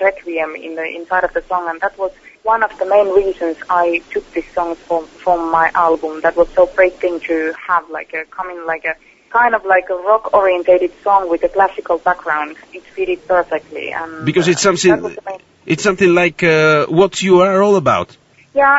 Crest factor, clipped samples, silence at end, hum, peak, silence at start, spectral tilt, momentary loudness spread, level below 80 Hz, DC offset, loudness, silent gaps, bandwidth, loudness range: 14 dB; under 0.1%; 0 s; none; 0 dBFS; 0 s; -5 dB/octave; 12 LU; -46 dBFS; under 0.1%; -15 LUFS; none; 8 kHz; 4 LU